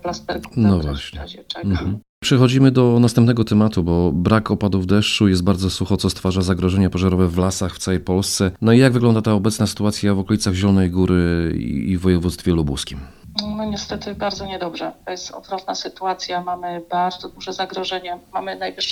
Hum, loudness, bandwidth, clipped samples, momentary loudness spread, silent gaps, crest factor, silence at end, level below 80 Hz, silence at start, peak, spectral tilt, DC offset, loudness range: none; -19 LUFS; 13.5 kHz; under 0.1%; 13 LU; 2.09-2.21 s; 18 dB; 0 s; -38 dBFS; 0.05 s; 0 dBFS; -6 dB/octave; under 0.1%; 9 LU